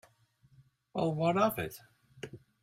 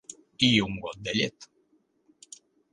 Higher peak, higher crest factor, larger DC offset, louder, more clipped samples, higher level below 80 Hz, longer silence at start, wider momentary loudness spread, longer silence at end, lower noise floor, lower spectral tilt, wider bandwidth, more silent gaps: second, -14 dBFS vs -6 dBFS; about the same, 20 dB vs 24 dB; neither; second, -32 LUFS vs -26 LUFS; neither; second, -68 dBFS vs -58 dBFS; first, 0.95 s vs 0.1 s; second, 20 LU vs 26 LU; second, 0.25 s vs 1.3 s; about the same, -67 dBFS vs -69 dBFS; first, -6.5 dB/octave vs -4 dB/octave; first, 16 kHz vs 11 kHz; neither